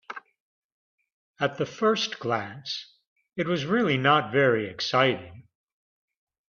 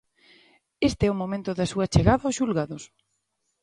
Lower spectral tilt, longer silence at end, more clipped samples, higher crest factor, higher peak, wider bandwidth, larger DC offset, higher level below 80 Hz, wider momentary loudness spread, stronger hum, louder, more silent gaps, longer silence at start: about the same, -5 dB/octave vs -6 dB/octave; first, 1.05 s vs 0.75 s; neither; about the same, 22 dB vs 24 dB; second, -6 dBFS vs -2 dBFS; second, 7.2 kHz vs 11.5 kHz; neither; second, -68 dBFS vs -40 dBFS; first, 14 LU vs 9 LU; neither; about the same, -25 LUFS vs -25 LUFS; first, 0.40-0.98 s, 1.12-1.34 s, 3.07-3.16 s vs none; second, 0.1 s vs 0.8 s